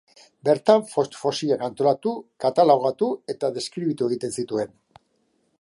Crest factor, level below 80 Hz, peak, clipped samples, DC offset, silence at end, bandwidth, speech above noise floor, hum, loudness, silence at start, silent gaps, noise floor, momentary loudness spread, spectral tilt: 20 dB; -70 dBFS; -2 dBFS; under 0.1%; under 0.1%; 0.95 s; 11.5 kHz; 46 dB; none; -23 LUFS; 0.45 s; none; -68 dBFS; 10 LU; -5.5 dB/octave